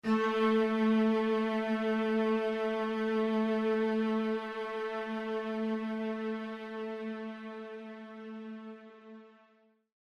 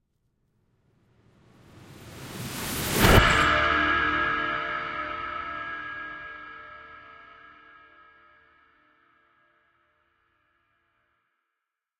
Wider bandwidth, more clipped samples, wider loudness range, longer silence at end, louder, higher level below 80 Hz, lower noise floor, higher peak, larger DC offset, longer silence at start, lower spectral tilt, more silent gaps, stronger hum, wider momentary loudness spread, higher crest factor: second, 7 kHz vs 16.5 kHz; neither; second, 12 LU vs 18 LU; second, 0.75 s vs 4.5 s; second, -32 LUFS vs -24 LUFS; second, -78 dBFS vs -40 dBFS; second, -68 dBFS vs -85 dBFS; second, -18 dBFS vs -4 dBFS; neither; second, 0.05 s vs 1.8 s; first, -7 dB/octave vs -4 dB/octave; neither; neither; second, 17 LU vs 27 LU; second, 14 dB vs 26 dB